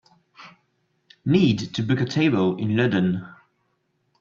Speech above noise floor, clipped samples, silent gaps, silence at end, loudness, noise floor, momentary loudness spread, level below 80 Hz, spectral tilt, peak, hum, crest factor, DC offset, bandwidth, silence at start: 50 dB; under 0.1%; none; 0.9 s; -22 LUFS; -71 dBFS; 6 LU; -60 dBFS; -7 dB/octave; -6 dBFS; none; 18 dB; under 0.1%; 7.4 kHz; 0.4 s